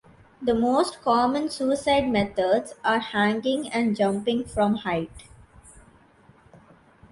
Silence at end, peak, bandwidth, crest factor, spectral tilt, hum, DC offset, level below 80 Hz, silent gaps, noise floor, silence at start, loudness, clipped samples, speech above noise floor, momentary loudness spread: 1.4 s; -8 dBFS; 11.5 kHz; 16 dB; -5 dB/octave; none; under 0.1%; -52 dBFS; none; -56 dBFS; 0.4 s; -24 LUFS; under 0.1%; 32 dB; 5 LU